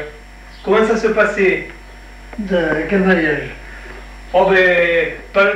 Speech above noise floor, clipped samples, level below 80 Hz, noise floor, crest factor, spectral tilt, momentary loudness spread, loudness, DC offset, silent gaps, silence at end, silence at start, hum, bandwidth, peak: 22 dB; under 0.1%; -38 dBFS; -37 dBFS; 14 dB; -6 dB/octave; 22 LU; -15 LUFS; under 0.1%; none; 0 s; 0 s; none; 10.5 kHz; -2 dBFS